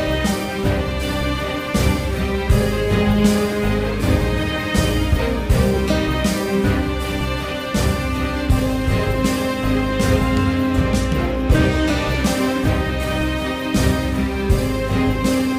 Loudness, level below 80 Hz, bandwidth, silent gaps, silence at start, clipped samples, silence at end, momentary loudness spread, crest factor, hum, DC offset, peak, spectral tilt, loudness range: -19 LUFS; -24 dBFS; 16 kHz; none; 0 s; under 0.1%; 0 s; 4 LU; 16 dB; none; under 0.1%; -2 dBFS; -6 dB/octave; 2 LU